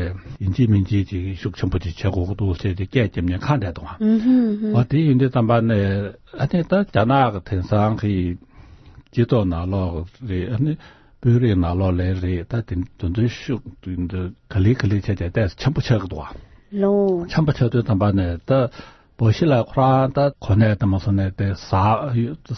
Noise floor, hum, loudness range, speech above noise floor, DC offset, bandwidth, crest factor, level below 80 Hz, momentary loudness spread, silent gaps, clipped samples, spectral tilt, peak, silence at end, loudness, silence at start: -45 dBFS; none; 4 LU; 26 dB; under 0.1%; 6.4 kHz; 16 dB; -42 dBFS; 10 LU; none; under 0.1%; -9 dB/octave; -4 dBFS; 0 s; -20 LUFS; 0 s